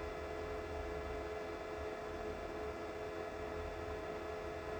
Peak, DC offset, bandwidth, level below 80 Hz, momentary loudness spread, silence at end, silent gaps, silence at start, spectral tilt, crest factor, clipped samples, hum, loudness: -32 dBFS; under 0.1%; over 20 kHz; -54 dBFS; 1 LU; 0 s; none; 0 s; -6 dB/octave; 12 dB; under 0.1%; none; -44 LUFS